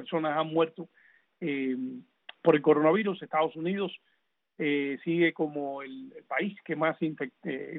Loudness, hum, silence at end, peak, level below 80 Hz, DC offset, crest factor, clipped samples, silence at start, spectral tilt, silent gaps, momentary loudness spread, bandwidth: -29 LUFS; none; 0 s; -10 dBFS; -78 dBFS; under 0.1%; 20 dB; under 0.1%; 0 s; -9.5 dB/octave; none; 16 LU; 4.1 kHz